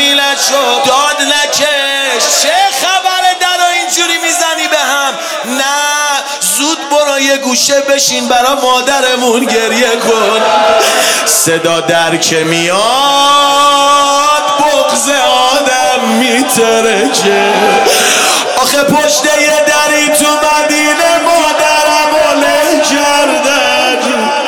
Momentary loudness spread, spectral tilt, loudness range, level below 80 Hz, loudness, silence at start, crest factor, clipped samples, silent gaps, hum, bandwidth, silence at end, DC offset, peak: 3 LU; -1 dB/octave; 2 LU; -50 dBFS; -8 LUFS; 0 s; 10 dB; under 0.1%; none; none; 19.5 kHz; 0 s; 0.1%; 0 dBFS